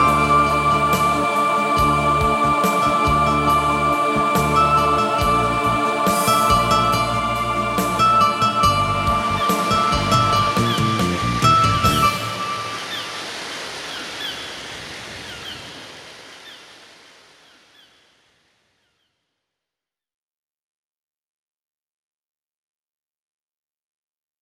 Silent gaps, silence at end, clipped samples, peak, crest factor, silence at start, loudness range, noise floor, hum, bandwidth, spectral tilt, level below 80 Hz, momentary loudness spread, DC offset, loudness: none; 7.75 s; under 0.1%; -2 dBFS; 18 dB; 0 s; 14 LU; -88 dBFS; none; 16.5 kHz; -4.5 dB/octave; -38 dBFS; 16 LU; under 0.1%; -18 LUFS